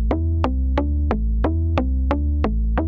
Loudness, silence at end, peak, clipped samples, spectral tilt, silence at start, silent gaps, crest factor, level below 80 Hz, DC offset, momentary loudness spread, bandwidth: -22 LUFS; 0 s; -4 dBFS; under 0.1%; -9.5 dB/octave; 0 s; none; 16 dB; -22 dBFS; under 0.1%; 1 LU; 5 kHz